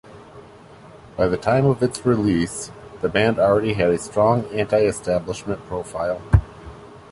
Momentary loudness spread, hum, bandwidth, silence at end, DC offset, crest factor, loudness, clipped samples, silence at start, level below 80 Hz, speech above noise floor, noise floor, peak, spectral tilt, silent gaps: 12 LU; none; 11.5 kHz; 0.1 s; under 0.1%; 20 dB; -21 LUFS; under 0.1%; 0.1 s; -36 dBFS; 24 dB; -44 dBFS; -2 dBFS; -6.5 dB/octave; none